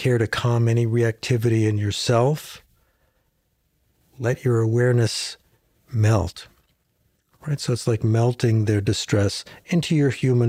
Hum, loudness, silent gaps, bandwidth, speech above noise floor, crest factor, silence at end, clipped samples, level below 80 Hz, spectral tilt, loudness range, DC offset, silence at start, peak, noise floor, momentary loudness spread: none; -22 LUFS; none; 14.5 kHz; 48 dB; 16 dB; 0 s; under 0.1%; -52 dBFS; -6 dB/octave; 3 LU; under 0.1%; 0 s; -6 dBFS; -69 dBFS; 10 LU